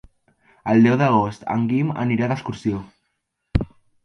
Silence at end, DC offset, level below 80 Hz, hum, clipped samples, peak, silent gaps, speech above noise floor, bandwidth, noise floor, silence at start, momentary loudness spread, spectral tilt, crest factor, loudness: 0.4 s; under 0.1%; -38 dBFS; none; under 0.1%; -2 dBFS; none; 55 dB; 6.6 kHz; -75 dBFS; 0.65 s; 11 LU; -8 dB/octave; 18 dB; -21 LUFS